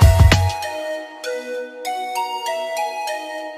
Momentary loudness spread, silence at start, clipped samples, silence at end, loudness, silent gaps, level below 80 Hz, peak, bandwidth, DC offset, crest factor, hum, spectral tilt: 14 LU; 0 s; under 0.1%; 0 s; -21 LUFS; none; -24 dBFS; 0 dBFS; 15.5 kHz; under 0.1%; 18 dB; none; -5 dB/octave